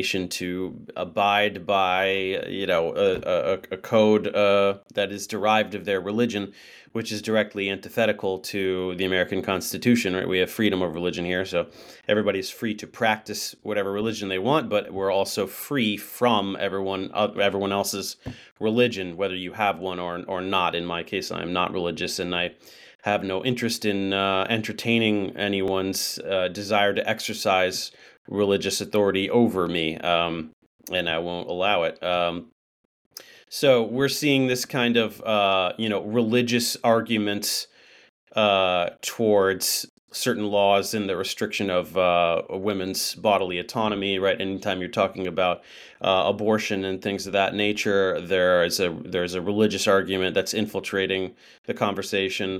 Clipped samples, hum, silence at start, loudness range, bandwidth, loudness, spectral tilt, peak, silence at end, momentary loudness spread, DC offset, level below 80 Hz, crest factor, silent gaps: under 0.1%; none; 0 s; 3 LU; 17.5 kHz; -24 LUFS; -4 dB/octave; -6 dBFS; 0 s; 8 LU; under 0.1%; -62 dBFS; 18 dB; 18.51-18.56 s, 22.95-22.99 s, 28.17-28.25 s, 30.53-30.79 s, 32.52-33.11 s, 38.09-38.27 s, 39.89-40.08 s, 51.58-51.64 s